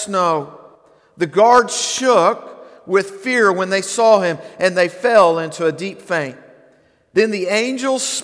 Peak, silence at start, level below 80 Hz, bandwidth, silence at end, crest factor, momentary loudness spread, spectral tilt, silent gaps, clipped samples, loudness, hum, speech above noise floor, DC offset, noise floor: 0 dBFS; 0 s; -66 dBFS; 11 kHz; 0 s; 16 dB; 10 LU; -3.5 dB/octave; none; under 0.1%; -16 LUFS; none; 38 dB; under 0.1%; -54 dBFS